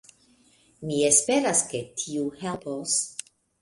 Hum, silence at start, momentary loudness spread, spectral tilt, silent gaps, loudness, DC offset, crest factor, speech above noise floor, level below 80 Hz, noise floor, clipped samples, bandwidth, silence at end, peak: none; 0.8 s; 14 LU; -2.5 dB/octave; none; -24 LUFS; under 0.1%; 22 dB; 35 dB; -66 dBFS; -61 dBFS; under 0.1%; 11.5 kHz; 0.4 s; -4 dBFS